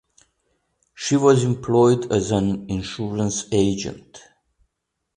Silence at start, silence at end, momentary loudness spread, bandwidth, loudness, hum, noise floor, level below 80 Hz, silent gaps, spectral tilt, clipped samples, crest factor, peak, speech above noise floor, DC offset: 1 s; 0.95 s; 12 LU; 10 kHz; -20 LUFS; none; -79 dBFS; -48 dBFS; none; -6 dB/octave; under 0.1%; 18 dB; -4 dBFS; 59 dB; under 0.1%